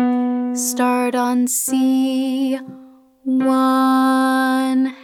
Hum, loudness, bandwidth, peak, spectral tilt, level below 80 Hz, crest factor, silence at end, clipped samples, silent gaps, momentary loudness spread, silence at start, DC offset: none; -17 LUFS; 18 kHz; -6 dBFS; -2.5 dB/octave; -74 dBFS; 12 dB; 0 s; under 0.1%; none; 7 LU; 0 s; under 0.1%